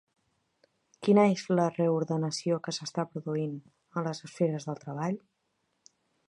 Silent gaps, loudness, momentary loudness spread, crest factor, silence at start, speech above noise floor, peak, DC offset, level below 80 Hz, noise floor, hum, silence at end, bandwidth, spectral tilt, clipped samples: none; -30 LUFS; 13 LU; 20 dB; 1 s; 48 dB; -10 dBFS; under 0.1%; -78 dBFS; -78 dBFS; none; 1.1 s; 11 kHz; -6.5 dB/octave; under 0.1%